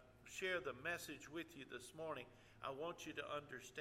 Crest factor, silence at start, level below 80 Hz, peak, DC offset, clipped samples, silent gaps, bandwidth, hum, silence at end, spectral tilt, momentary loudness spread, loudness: 20 dB; 0 s; -76 dBFS; -30 dBFS; under 0.1%; under 0.1%; none; 16 kHz; none; 0 s; -3.5 dB/octave; 10 LU; -49 LUFS